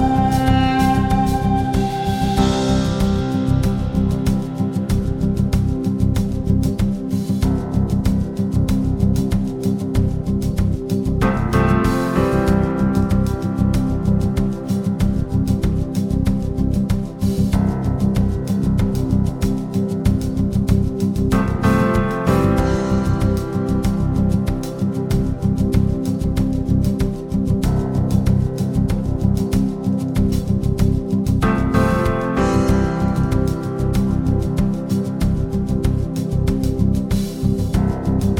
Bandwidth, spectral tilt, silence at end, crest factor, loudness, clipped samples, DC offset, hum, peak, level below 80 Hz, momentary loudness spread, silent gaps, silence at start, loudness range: 16.5 kHz; -7.5 dB/octave; 0 s; 16 dB; -19 LUFS; under 0.1%; under 0.1%; none; -2 dBFS; -26 dBFS; 4 LU; none; 0 s; 2 LU